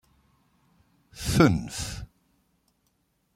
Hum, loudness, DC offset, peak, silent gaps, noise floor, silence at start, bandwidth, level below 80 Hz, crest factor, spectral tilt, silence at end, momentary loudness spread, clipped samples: none; -25 LUFS; under 0.1%; -4 dBFS; none; -72 dBFS; 1.15 s; 16 kHz; -46 dBFS; 26 dB; -5.5 dB/octave; 1.3 s; 20 LU; under 0.1%